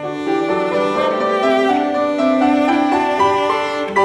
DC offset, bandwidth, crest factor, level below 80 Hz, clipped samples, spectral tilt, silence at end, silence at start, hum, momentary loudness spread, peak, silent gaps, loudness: under 0.1%; 12 kHz; 14 dB; -54 dBFS; under 0.1%; -5 dB/octave; 0 s; 0 s; none; 4 LU; -2 dBFS; none; -16 LUFS